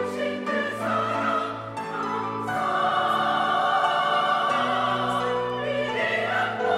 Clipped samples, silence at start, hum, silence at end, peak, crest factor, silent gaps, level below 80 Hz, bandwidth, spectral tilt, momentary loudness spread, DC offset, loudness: under 0.1%; 0 s; none; 0 s; -10 dBFS; 14 dB; none; -64 dBFS; 15.5 kHz; -4.5 dB/octave; 6 LU; under 0.1%; -24 LUFS